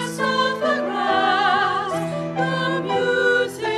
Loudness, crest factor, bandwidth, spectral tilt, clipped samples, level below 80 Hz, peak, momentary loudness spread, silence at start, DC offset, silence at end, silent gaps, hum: -20 LUFS; 14 dB; 14 kHz; -4.5 dB/octave; under 0.1%; -64 dBFS; -6 dBFS; 6 LU; 0 s; under 0.1%; 0 s; none; none